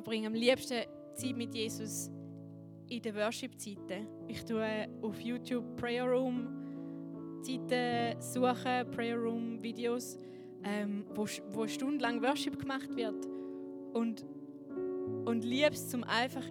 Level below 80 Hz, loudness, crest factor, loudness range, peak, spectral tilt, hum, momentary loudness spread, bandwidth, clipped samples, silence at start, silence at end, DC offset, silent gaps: -76 dBFS; -37 LUFS; 22 dB; 4 LU; -14 dBFS; -4.5 dB/octave; none; 13 LU; 18.5 kHz; under 0.1%; 0 s; 0 s; under 0.1%; none